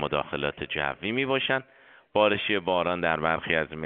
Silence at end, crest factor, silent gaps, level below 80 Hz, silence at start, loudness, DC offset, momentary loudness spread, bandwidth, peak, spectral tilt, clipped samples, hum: 0 s; 20 dB; none; -56 dBFS; 0 s; -26 LUFS; under 0.1%; 6 LU; 4.5 kHz; -8 dBFS; -2 dB/octave; under 0.1%; none